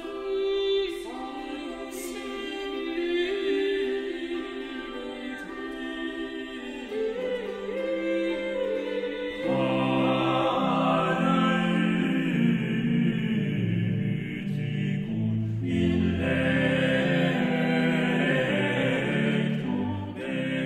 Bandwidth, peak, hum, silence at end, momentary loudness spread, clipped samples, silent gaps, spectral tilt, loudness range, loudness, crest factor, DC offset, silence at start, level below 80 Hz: 14.5 kHz; -12 dBFS; none; 0 s; 11 LU; under 0.1%; none; -7 dB/octave; 7 LU; -27 LUFS; 16 dB; under 0.1%; 0 s; -54 dBFS